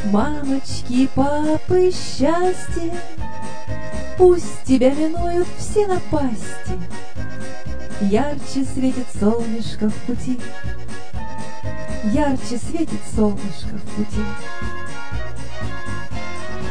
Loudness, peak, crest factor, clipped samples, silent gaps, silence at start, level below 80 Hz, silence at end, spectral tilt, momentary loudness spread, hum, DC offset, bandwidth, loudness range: -22 LUFS; -2 dBFS; 20 dB; under 0.1%; none; 0 s; -36 dBFS; 0 s; -6 dB/octave; 14 LU; none; 10%; 10 kHz; 6 LU